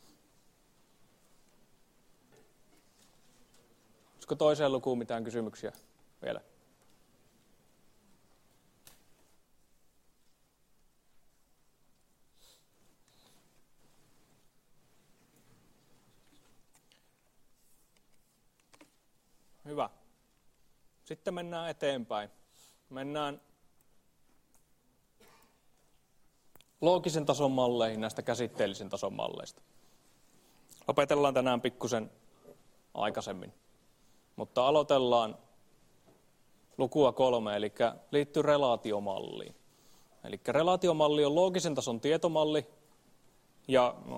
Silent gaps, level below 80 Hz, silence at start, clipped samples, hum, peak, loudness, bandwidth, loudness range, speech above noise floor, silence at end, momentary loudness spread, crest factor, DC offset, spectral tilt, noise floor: none; -72 dBFS; 4.2 s; under 0.1%; none; -10 dBFS; -31 LUFS; 16 kHz; 15 LU; 39 dB; 0 s; 18 LU; 24 dB; under 0.1%; -5 dB/octave; -70 dBFS